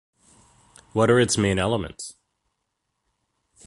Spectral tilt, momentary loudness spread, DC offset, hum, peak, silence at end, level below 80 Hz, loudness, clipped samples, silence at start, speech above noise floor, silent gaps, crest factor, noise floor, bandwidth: -4.5 dB/octave; 18 LU; under 0.1%; none; -6 dBFS; 1.55 s; -48 dBFS; -22 LUFS; under 0.1%; 0.95 s; 57 dB; none; 20 dB; -78 dBFS; 11.5 kHz